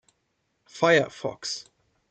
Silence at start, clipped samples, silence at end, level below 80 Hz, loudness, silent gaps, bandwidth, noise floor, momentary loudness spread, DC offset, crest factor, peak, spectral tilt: 0.75 s; under 0.1%; 0.5 s; -72 dBFS; -25 LUFS; none; 9 kHz; -75 dBFS; 12 LU; under 0.1%; 22 dB; -6 dBFS; -4 dB/octave